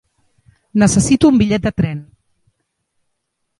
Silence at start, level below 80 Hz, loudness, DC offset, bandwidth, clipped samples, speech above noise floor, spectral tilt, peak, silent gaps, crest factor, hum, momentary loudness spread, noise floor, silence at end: 0.75 s; -40 dBFS; -14 LUFS; under 0.1%; 11.5 kHz; under 0.1%; 59 dB; -5.5 dB/octave; 0 dBFS; none; 18 dB; none; 10 LU; -72 dBFS; 1.55 s